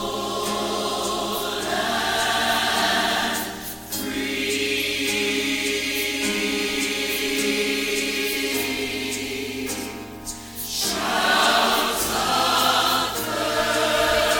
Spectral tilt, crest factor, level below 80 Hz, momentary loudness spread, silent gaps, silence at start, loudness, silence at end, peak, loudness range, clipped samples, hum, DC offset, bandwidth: -1.5 dB/octave; 16 dB; -48 dBFS; 10 LU; none; 0 s; -22 LUFS; 0 s; -6 dBFS; 4 LU; under 0.1%; none; under 0.1%; 18 kHz